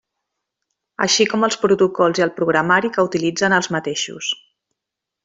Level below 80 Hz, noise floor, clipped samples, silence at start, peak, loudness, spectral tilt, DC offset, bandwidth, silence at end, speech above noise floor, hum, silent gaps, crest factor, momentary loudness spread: -62 dBFS; -83 dBFS; under 0.1%; 1 s; -2 dBFS; -18 LUFS; -3.5 dB/octave; under 0.1%; 8.2 kHz; 0.9 s; 66 dB; none; none; 16 dB; 9 LU